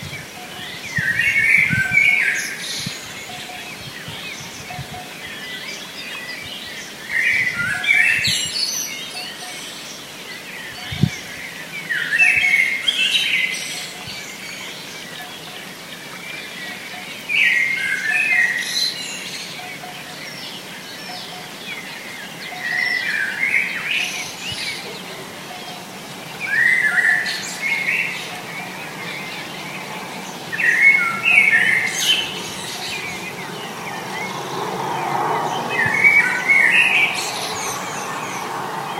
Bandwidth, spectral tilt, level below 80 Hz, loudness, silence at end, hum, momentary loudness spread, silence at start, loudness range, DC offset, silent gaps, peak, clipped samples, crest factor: 16 kHz; -1.5 dB/octave; -58 dBFS; -18 LUFS; 0 s; none; 18 LU; 0 s; 12 LU; under 0.1%; none; 0 dBFS; under 0.1%; 22 dB